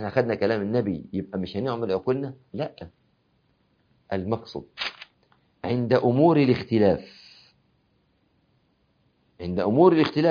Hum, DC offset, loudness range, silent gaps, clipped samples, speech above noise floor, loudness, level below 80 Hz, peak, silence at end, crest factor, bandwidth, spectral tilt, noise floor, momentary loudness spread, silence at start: none; under 0.1%; 9 LU; none; under 0.1%; 44 dB; -24 LUFS; -60 dBFS; -4 dBFS; 0 s; 22 dB; 5.2 kHz; -8.5 dB/octave; -67 dBFS; 17 LU; 0 s